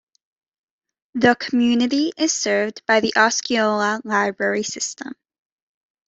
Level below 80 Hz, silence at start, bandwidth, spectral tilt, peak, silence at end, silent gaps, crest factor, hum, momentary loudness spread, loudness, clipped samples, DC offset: -64 dBFS; 1.15 s; 8.2 kHz; -2.5 dB/octave; -2 dBFS; 0.95 s; none; 20 dB; none; 9 LU; -19 LUFS; under 0.1%; under 0.1%